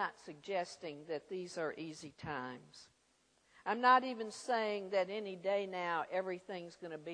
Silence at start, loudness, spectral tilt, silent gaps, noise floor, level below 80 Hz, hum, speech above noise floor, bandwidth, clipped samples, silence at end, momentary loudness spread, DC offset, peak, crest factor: 0 s; -38 LUFS; -4 dB/octave; none; -74 dBFS; -78 dBFS; none; 36 dB; 10.5 kHz; under 0.1%; 0 s; 17 LU; under 0.1%; -16 dBFS; 24 dB